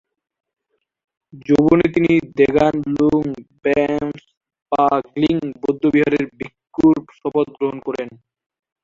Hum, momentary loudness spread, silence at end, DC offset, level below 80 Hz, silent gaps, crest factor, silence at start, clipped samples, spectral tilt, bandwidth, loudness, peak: none; 13 LU; 0.75 s; under 0.1%; -50 dBFS; 4.37-4.41 s, 4.62-4.66 s; 16 dB; 1.35 s; under 0.1%; -8 dB/octave; 7.2 kHz; -18 LUFS; -2 dBFS